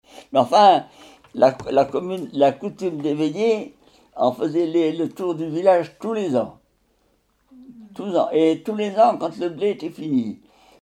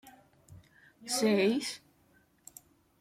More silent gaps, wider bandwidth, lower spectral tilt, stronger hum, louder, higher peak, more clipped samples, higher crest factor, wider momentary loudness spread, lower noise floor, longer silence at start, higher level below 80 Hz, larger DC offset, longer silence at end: neither; second, 13 kHz vs 16.5 kHz; first, -6.5 dB/octave vs -4 dB/octave; neither; first, -21 LUFS vs -30 LUFS; first, -2 dBFS vs -16 dBFS; neither; about the same, 20 dB vs 18 dB; second, 10 LU vs 25 LU; about the same, -64 dBFS vs -67 dBFS; about the same, 0.15 s vs 0.05 s; first, -64 dBFS vs -76 dBFS; neither; second, 0.45 s vs 1.25 s